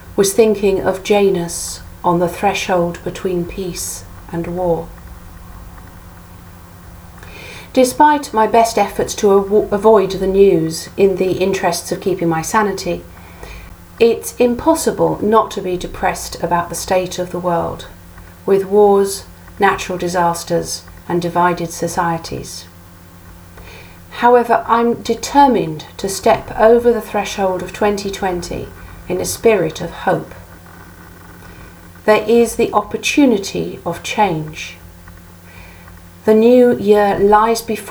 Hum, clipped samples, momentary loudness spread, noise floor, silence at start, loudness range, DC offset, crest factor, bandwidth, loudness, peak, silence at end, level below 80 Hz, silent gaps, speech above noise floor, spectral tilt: none; under 0.1%; 20 LU; -39 dBFS; 0 s; 7 LU; under 0.1%; 16 dB; over 20 kHz; -15 LUFS; 0 dBFS; 0 s; -40 dBFS; none; 24 dB; -4.5 dB/octave